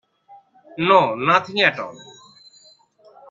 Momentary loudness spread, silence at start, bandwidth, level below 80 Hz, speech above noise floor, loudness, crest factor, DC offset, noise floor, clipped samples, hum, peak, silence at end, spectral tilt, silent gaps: 18 LU; 0.75 s; 7.6 kHz; -64 dBFS; 35 dB; -17 LUFS; 22 dB; under 0.1%; -53 dBFS; under 0.1%; none; 0 dBFS; 1.3 s; -5 dB/octave; none